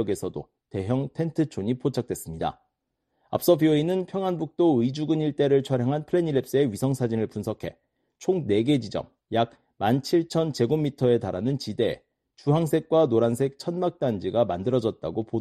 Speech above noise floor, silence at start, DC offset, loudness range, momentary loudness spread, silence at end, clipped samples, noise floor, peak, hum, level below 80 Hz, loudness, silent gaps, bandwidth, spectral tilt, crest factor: 54 dB; 0 s; under 0.1%; 3 LU; 10 LU; 0 s; under 0.1%; -78 dBFS; -6 dBFS; none; -58 dBFS; -25 LUFS; none; 13.5 kHz; -7 dB/octave; 18 dB